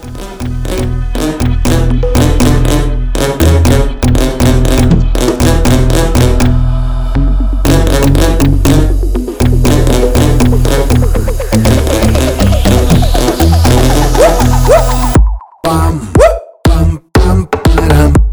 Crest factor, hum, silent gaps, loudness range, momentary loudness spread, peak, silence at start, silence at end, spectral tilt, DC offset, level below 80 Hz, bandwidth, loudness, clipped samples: 8 dB; none; none; 2 LU; 7 LU; 0 dBFS; 0 s; 0 s; -6 dB/octave; 0.7%; -12 dBFS; over 20 kHz; -10 LUFS; 0.6%